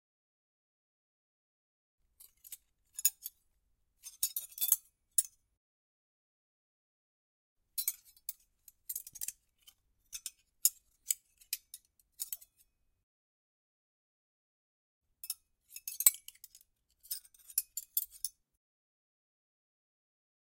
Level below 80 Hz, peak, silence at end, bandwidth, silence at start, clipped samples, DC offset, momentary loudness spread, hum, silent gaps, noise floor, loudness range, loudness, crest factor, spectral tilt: -80 dBFS; -6 dBFS; 2.25 s; 16.5 kHz; 2.2 s; under 0.1%; under 0.1%; 22 LU; none; 5.57-7.56 s, 13.03-15.01 s; -77 dBFS; 13 LU; -35 LUFS; 36 dB; 4 dB/octave